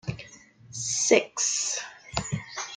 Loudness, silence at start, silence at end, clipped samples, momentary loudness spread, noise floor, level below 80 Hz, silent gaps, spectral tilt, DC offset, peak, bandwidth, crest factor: -26 LUFS; 0.05 s; 0 s; under 0.1%; 19 LU; -51 dBFS; -54 dBFS; none; -2.5 dB/octave; under 0.1%; -6 dBFS; 10.5 kHz; 24 dB